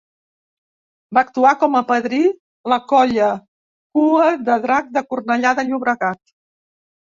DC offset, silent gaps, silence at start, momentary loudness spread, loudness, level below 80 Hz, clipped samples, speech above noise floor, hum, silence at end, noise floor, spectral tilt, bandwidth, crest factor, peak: under 0.1%; 2.40-2.64 s, 3.48-3.90 s; 1.1 s; 8 LU; -17 LUFS; -62 dBFS; under 0.1%; over 74 dB; none; 0.9 s; under -90 dBFS; -5 dB/octave; 7.4 kHz; 16 dB; -2 dBFS